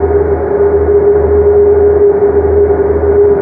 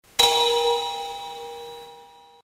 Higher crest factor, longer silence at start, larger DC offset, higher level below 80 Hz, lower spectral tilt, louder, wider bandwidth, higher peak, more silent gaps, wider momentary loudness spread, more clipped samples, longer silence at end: second, 8 dB vs 22 dB; second, 0 s vs 0.2 s; neither; first, -22 dBFS vs -58 dBFS; first, -13 dB/octave vs 0.5 dB/octave; first, -9 LUFS vs -21 LUFS; second, 2.5 kHz vs 16 kHz; first, 0 dBFS vs -4 dBFS; neither; second, 4 LU vs 21 LU; neither; second, 0 s vs 0.35 s